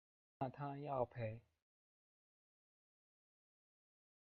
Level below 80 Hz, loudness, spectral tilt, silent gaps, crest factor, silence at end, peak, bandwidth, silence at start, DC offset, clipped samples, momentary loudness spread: -78 dBFS; -46 LUFS; -7.5 dB/octave; none; 24 dB; 3 s; -26 dBFS; 4.9 kHz; 0.4 s; under 0.1%; under 0.1%; 6 LU